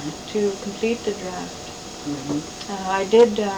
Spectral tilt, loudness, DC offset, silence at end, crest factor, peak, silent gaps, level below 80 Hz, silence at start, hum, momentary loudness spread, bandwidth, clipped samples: -4.5 dB/octave; -23 LUFS; under 0.1%; 0 s; 20 dB; -4 dBFS; none; -52 dBFS; 0 s; none; 17 LU; 19.5 kHz; under 0.1%